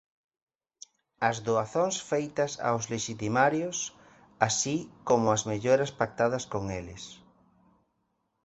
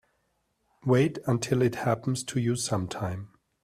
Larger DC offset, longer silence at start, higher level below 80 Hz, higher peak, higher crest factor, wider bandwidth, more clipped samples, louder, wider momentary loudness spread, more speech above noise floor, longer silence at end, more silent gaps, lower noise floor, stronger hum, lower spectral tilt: neither; first, 1.2 s vs 0.85 s; about the same, -60 dBFS vs -60 dBFS; first, -6 dBFS vs -12 dBFS; first, 24 dB vs 18 dB; second, 8.2 kHz vs 14.5 kHz; neither; about the same, -29 LUFS vs -28 LUFS; about the same, 9 LU vs 10 LU; about the same, 49 dB vs 47 dB; first, 1.3 s vs 0.35 s; neither; about the same, -77 dBFS vs -74 dBFS; neither; second, -4 dB/octave vs -6 dB/octave